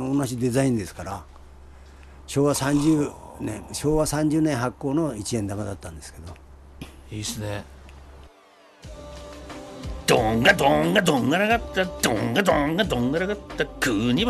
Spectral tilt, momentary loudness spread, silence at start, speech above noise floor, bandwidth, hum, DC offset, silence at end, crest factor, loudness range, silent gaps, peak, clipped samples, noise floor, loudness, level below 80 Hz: -5 dB/octave; 21 LU; 0 s; 30 dB; 13 kHz; none; under 0.1%; 0 s; 18 dB; 16 LU; none; -6 dBFS; under 0.1%; -53 dBFS; -23 LUFS; -42 dBFS